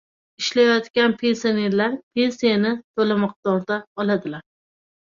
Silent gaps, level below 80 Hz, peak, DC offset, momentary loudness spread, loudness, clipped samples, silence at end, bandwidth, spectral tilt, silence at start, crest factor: 0.90-0.94 s, 2.03-2.11 s, 2.84-2.94 s, 3.36-3.43 s, 3.87-3.95 s; -66 dBFS; -4 dBFS; under 0.1%; 7 LU; -21 LUFS; under 0.1%; 0.65 s; 7.4 kHz; -5 dB/octave; 0.4 s; 18 dB